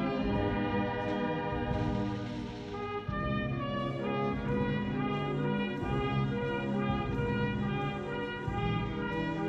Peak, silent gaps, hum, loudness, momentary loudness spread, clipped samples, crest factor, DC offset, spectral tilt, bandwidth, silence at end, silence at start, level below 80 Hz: -18 dBFS; none; none; -33 LUFS; 5 LU; under 0.1%; 14 dB; under 0.1%; -8 dB/octave; 8 kHz; 0 s; 0 s; -46 dBFS